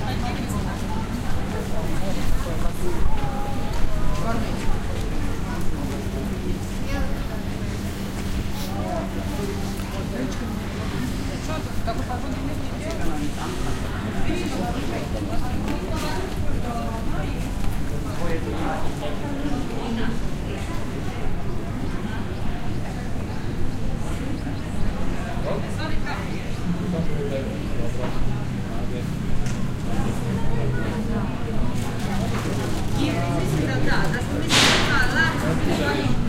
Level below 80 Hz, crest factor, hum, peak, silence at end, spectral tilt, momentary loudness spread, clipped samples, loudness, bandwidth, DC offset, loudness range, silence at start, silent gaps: -28 dBFS; 20 dB; none; -2 dBFS; 0 s; -5 dB/octave; 6 LU; under 0.1%; -26 LUFS; 15.5 kHz; under 0.1%; 5 LU; 0 s; none